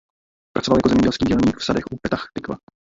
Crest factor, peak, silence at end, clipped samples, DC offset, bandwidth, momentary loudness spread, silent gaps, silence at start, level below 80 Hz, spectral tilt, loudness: 18 dB; -2 dBFS; 0.3 s; under 0.1%; under 0.1%; 7.8 kHz; 13 LU; none; 0.55 s; -42 dBFS; -6 dB/octave; -20 LUFS